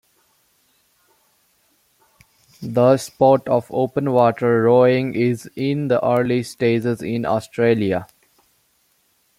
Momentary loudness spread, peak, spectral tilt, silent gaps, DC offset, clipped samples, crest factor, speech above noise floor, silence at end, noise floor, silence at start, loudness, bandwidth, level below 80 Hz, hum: 8 LU; -2 dBFS; -7 dB/octave; none; under 0.1%; under 0.1%; 18 dB; 45 dB; 1.35 s; -63 dBFS; 2.6 s; -18 LUFS; 15.5 kHz; -60 dBFS; none